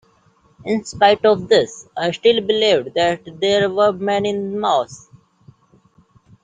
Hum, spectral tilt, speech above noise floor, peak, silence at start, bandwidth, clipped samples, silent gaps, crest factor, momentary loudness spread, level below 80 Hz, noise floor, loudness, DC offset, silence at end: none; -4.5 dB/octave; 39 dB; -2 dBFS; 0.65 s; 9.4 kHz; under 0.1%; none; 18 dB; 9 LU; -58 dBFS; -56 dBFS; -17 LUFS; under 0.1%; 1.45 s